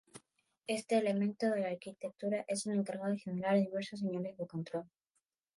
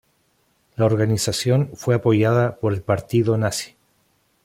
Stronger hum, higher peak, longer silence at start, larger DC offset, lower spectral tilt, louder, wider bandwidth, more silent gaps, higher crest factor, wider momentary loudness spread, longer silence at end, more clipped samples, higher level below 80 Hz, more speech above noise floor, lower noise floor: neither; second, -20 dBFS vs -4 dBFS; second, 0.15 s vs 0.8 s; neither; about the same, -6 dB/octave vs -6 dB/octave; second, -36 LUFS vs -20 LUFS; second, 11.5 kHz vs 16 kHz; neither; about the same, 16 dB vs 16 dB; first, 10 LU vs 7 LU; about the same, 0.7 s vs 0.8 s; neither; second, -84 dBFS vs -54 dBFS; first, 49 dB vs 45 dB; first, -84 dBFS vs -64 dBFS